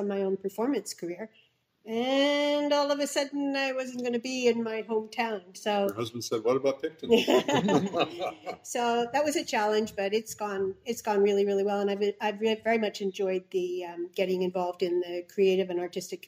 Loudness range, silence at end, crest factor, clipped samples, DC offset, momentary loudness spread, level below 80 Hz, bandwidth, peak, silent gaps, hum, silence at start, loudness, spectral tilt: 2 LU; 0.1 s; 20 dB; under 0.1%; under 0.1%; 9 LU; -74 dBFS; 16 kHz; -8 dBFS; none; none; 0 s; -29 LUFS; -4.5 dB/octave